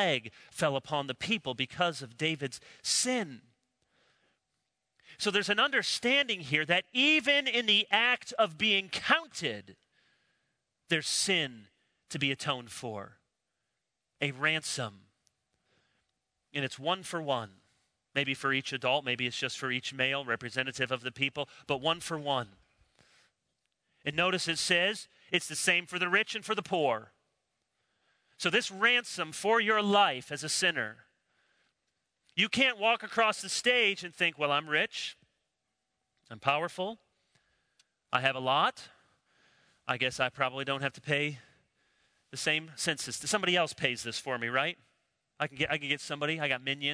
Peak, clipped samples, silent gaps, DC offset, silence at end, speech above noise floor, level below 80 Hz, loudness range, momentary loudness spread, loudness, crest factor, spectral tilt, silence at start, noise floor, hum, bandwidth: -10 dBFS; under 0.1%; none; under 0.1%; 0 s; 54 dB; -74 dBFS; 8 LU; 11 LU; -30 LUFS; 24 dB; -2.5 dB/octave; 0 s; -85 dBFS; none; 11 kHz